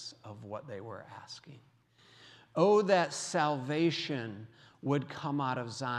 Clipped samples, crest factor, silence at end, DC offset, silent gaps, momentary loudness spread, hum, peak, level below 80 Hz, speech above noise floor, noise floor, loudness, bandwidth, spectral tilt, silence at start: under 0.1%; 20 dB; 0 s; under 0.1%; none; 21 LU; none; -14 dBFS; -82 dBFS; 28 dB; -61 dBFS; -31 LUFS; 11.5 kHz; -5 dB/octave; 0 s